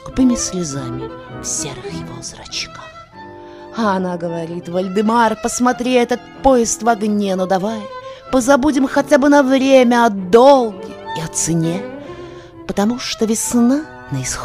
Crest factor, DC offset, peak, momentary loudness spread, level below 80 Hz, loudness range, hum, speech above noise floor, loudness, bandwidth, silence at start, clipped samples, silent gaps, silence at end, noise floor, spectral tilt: 16 dB; under 0.1%; 0 dBFS; 20 LU; -42 dBFS; 11 LU; none; 20 dB; -16 LUFS; 16 kHz; 0 s; under 0.1%; none; 0 s; -36 dBFS; -4.5 dB/octave